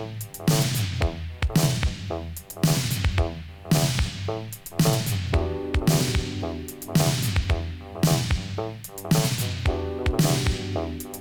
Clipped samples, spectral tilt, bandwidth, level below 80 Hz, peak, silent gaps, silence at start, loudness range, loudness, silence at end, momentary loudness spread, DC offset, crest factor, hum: under 0.1%; -5 dB/octave; over 20 kHz; -34 dBFS; -6 dBFS; none; 0 s; 1 LU; -25 LUFS; 0 s; 10 LU; under 0.1%; 18 dB; none